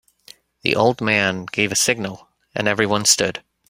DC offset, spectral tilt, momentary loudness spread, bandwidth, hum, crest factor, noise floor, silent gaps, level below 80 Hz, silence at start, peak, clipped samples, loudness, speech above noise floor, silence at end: under 0.1%; -2.5 dB/octave; 9 LU; 16 kHz; none; 20 dB; -49 dBFS; none; -56 dBFS; 0.65 s; -2 dBFS; under 0.1%; -18 LUFS; 30 dB; 0.3 s